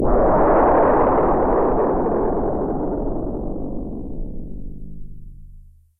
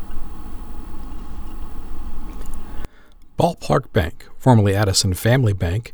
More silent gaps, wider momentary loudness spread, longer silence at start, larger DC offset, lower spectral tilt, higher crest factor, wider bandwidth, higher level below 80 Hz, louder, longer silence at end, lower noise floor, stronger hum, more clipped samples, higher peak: neither; about the same, 20 LU vs 21 LU; about the same, 0 s vs 0 s; neither; first, -12 dB/octave vs -5.5 dB/octave; about the same, 14 dB vs 18 dB; second, 3 kHz vs 20 kHz; about the same, -28 dBFS vs -30 dBFS; about the same, -19 LUFS vs -18 LUFS; first, 0.3 s vs 0 s; about the same, -44 dBFS vs -42 dBFS; neither; neither; second, -4 dBFS vs 0 dBFS